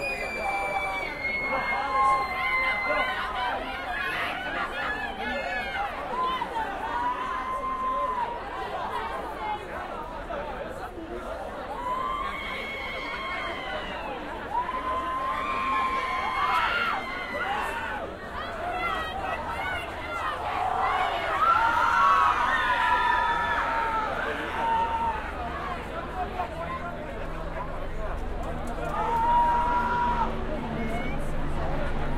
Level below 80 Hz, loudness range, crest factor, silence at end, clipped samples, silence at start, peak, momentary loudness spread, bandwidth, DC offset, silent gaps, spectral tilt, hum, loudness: -40 dBFS; 10 LU; 18 dB; 0 s; under 0.1%; 0 s; -10 dBFS; 12 LU; 15.5 kHz; under 0.1%; none; -4.5 dB/octave; none; -28 LUFS